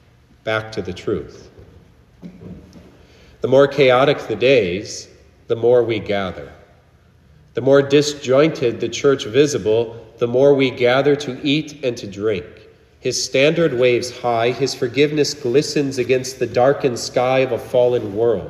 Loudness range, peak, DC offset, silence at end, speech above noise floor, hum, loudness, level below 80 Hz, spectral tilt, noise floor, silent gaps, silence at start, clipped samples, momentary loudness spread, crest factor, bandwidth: 3 LU; -2 dBFS; under 0.1%; 0 s; 34 dB; none; -18 LUFS; -52 dBFS; -5 dB/octave; -51 dBFS; none; 0.45 s; under 0.1%; 12 LU; 18 dB; 13 kHz